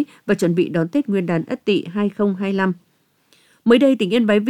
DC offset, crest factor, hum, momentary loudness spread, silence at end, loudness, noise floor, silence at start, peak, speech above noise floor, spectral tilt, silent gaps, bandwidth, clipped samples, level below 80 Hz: under 0.1%; 16 dB; none; 8 LU; 0 s; -19 LUFS; -60 dBFS; 0 s; -2 dBFS; 42 dB; -7 dB/octave; none; 13.5 kHz; under 0.1%; -62 dBFS